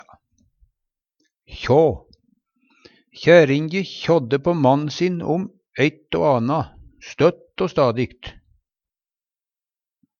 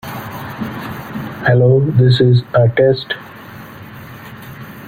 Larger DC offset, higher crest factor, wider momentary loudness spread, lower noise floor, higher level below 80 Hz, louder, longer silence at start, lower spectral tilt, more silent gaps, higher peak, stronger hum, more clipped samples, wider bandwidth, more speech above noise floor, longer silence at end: neither; first, 22 dB vs 14 dB; second, 17 LU vs 23 LU; first, under -90 dBFS vs -34 dBFS; about the same, -50 dBFS vs -46 dBFS; second, -19 LUFS vs -14 LUFS; first, 1.5 s vs 0.05 s; about the same, -7 dB/octave vs -8 dB/octave; neither; about the same, 0 dBFS vs -2 dBFS; neither; neither; second, 7 kHz vs 16 kHz; first, over 72 dB vs 22 dB; first, 1.9 s vs 0 s